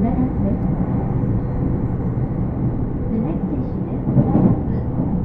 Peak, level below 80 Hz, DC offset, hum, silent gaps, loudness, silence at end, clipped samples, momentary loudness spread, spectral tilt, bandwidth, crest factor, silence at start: -2 dBFS; -28 dBFS; under 0.1%; none; none; -21 LUFS; 0 s; under 0.1%; 6 LU; -13 dB/octave; 3.1 kHz; 18 dB; 0 s